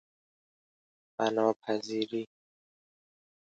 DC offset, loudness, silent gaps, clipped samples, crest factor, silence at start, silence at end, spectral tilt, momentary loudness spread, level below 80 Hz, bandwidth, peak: under 0.1%; -32 LUFS; 1.56-1.60 s; under 0.1%; 24 dB; 1.2 s; 1.2 s; -5 dB/octave; 15 LU; -84 dBFS; 8 kHz; -12 dBFS